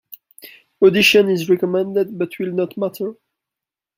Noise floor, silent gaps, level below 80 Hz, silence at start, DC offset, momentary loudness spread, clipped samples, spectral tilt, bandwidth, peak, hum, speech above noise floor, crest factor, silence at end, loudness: -87 dBFS; none; -62 dBFS; 0.1 s; under 0.1%; 14 LU; under 0.1%; -4.5 dB/octave; 16 kHz; -2 dBFS; none; 70 dB; 18 dB; 0.85 s; -17 LUFS